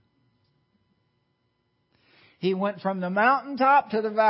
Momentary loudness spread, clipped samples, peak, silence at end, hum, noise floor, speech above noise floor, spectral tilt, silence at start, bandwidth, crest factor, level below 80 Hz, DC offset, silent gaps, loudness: 8 LU; under 0.1%; -8 dBFS; 0 s; none; -73 dBFS; 50 dB; -10 dB/octave; 2.4 s; 5.8 kHz; 18 dB; -78 dBFS; under 0.1%; none; -24 LUFS